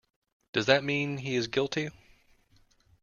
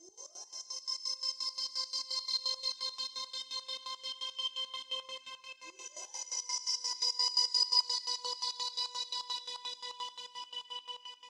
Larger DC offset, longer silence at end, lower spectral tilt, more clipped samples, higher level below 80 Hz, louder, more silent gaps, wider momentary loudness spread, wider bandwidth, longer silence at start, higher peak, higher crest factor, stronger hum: neither; first, 1.1 s vs 0 s; first, -5 dB/octave vs 4 dB/octave; neither; first, -64 dBFS vs under -90 dBFS; first, -29 LUFS vs -34 LUFS; neither; second, 9 LU vs 16 LU; second, 7.4 kHz vs 15.5 kHz; first, 0.55 s vs 0 s; first, -4 dBFS vs -16 dBFS; about the same, 26 dB vs 22 dB; neither